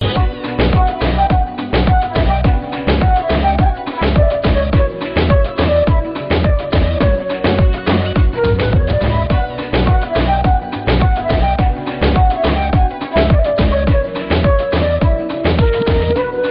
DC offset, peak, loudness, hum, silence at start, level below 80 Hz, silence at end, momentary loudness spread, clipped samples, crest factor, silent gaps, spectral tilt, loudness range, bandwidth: under 0.1%; -2 dBFS; -15 LUFS; none; 0 s; -18 dBFS; 0 s; 4 LU; under 0.1%; 12 dB; none; -6 dB/octave; 1 LU; 5.4 kHz